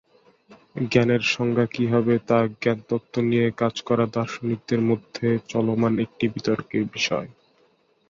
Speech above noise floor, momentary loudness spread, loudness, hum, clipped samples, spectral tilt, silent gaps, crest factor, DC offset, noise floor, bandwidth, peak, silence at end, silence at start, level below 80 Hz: 40 dB; 7 LU; -23 LUFS; none; under 0.1%; -6.5 dB/octave; none; 18 dB; under 0.1%; -63 dBFS; 7.6 kHz; -4 dBFS; 0.8 s; 0.5 s; -58 dBFS